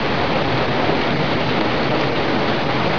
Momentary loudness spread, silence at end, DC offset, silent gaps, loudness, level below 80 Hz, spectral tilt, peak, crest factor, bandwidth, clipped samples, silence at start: 1 LU; 0 s; 5%; none; -19 LUFS; -40 dBFS; -6.5 dB/octave; -4 dBFS; 14 dB; 5.4 kHz; under 0.1%; 0 s